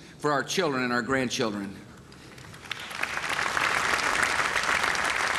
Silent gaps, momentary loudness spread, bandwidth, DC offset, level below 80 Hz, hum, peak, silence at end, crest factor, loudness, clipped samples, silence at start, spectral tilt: none; 17 LU; 15.5 kHz; under 0.1%; -56 dBFS; none; -8 dBFS; 0 s; 20 dB; -26 LUFS; under 0.1%; 0 s; -2.5 dB/octave